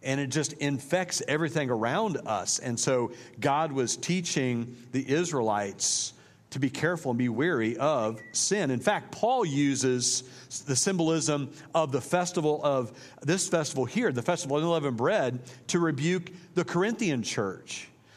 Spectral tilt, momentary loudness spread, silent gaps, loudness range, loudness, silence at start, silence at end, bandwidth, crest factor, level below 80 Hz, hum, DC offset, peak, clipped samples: -4 dB/octave; 6 LU; none; 2 LU; -28 LUFS; 0 s; 0.3 s; 15 kHz; 20 dB; -72 dBFS; none; under 0.1%; -8 dBFS; under 0.1%